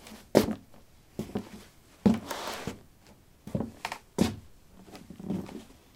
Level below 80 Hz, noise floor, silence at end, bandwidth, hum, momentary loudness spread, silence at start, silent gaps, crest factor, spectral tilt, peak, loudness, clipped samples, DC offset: -56 dBFS; -57 dBFS; 0.25 s; 18 kHz; none; 22 LU; 0 s; none; 32 dB; -6 dB/octave; -2 dBFS; -32 LUFS; under 0.1%; under 0.1%